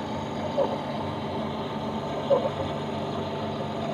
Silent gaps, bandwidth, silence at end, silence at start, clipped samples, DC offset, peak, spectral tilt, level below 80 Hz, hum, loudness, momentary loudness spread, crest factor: none; 14 kHz; 0 s; 0 s; under 0.1%; under 0.1%; -10 dBFS; -6.5 dB/octave; -54 dBFS; none; -29 LUFS; 6 LU; 18 dB